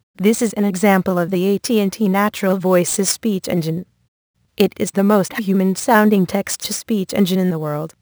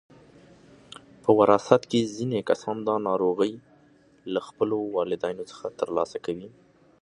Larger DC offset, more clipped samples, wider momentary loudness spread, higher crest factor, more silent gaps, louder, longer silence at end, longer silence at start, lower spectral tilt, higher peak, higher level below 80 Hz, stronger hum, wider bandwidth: neither; neither; second, 6 LU vs 17 LU; second, 18 dB vs 26 dB; first, 4.08-4.34 s vs none; first, -17 LUFS vs -26 LUFS; second, 0.15 s vs 0.5 s; second, 0.2 s vs 1.25 s; about the same, -5 dB/octave vs -6 dB/octave; about the same, 0 dBFS vs 0 dBFS; first, -58 dBFS vs -66 dBFS; neither; first, over 20 kHz vs 10.5 kHz